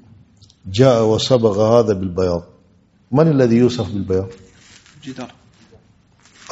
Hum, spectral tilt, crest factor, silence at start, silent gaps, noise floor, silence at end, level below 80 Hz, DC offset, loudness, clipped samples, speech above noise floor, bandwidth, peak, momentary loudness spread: none; -6.5 dB/octave; 18 dB; 0.65 s; none; -54 dBFS; 1.25 s; -50 dBFS; under 0.1%; -16 LUFS; under 0.1%; 39 dB; 8 kHz; 0 dBFS; 19 LU